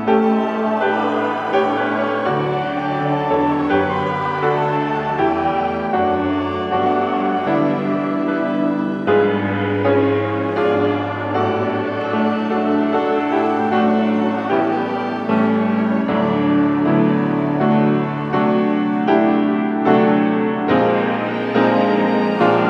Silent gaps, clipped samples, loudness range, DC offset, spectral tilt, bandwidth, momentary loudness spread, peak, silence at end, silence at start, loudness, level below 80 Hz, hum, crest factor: none; under 0.1%; 2 LU; under 0.1%; -8.5 dB/octave; 6.6 kHz; 4 LU; 0 dBFS; 0 s; 0 s; -18 LUFS; -54 dBFS; none; 16 dB